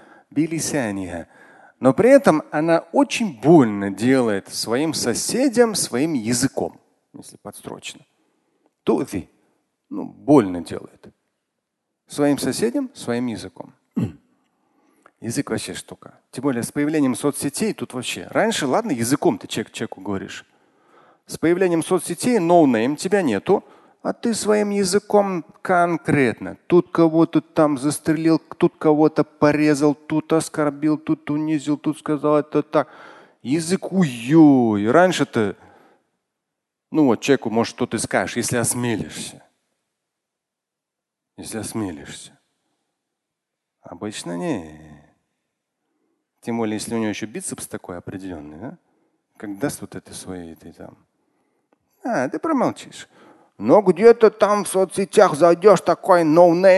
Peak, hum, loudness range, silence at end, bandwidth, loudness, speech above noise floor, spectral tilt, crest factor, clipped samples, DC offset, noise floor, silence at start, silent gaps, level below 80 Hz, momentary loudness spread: 0 dBFS; none; 15 LU; 0 s; 12.5 kHz; -19 LUFS; 64 dB; -5 dB/octave; 20 dB; under 0.1%; under 0.1%; -84 dBFS; 0.35 s; none; -58 dBFS; 19 LU